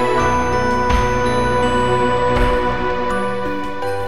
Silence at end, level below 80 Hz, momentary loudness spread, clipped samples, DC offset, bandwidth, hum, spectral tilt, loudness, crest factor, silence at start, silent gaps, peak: 0 s; -28 dBFS; 6 LU; under 0.1%; 5%; 12.5 kHz; none; -5.5 dB/octave; -17 LUFS; 14 dB; 0 s; none; -4 dBFS